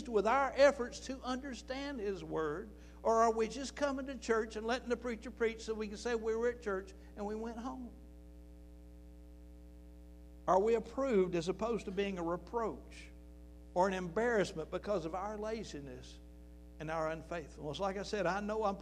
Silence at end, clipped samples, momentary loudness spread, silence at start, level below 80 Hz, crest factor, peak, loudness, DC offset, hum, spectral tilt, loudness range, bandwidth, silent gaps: 0 s; under 0.1%; 25 LU; 0 s; -54 dBFS; 22 dB; -14 dBFS; -36 LUFS; under 0.1%; none; -5 dB/octave; 6 LU; 12 kHz; none